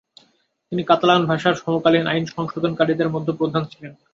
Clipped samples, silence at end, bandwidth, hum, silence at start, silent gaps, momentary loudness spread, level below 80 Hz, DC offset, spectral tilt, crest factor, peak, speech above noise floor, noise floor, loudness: under 0.1%; 0.2 s; 7.6 kHz; none; 0.7 s; none; 11 LU; -60 dBFS; under 0.1%; -6.5 dB/octave; 20 dB; -2 dBFS; 42 dB; -61 dBFS; -20 LUFS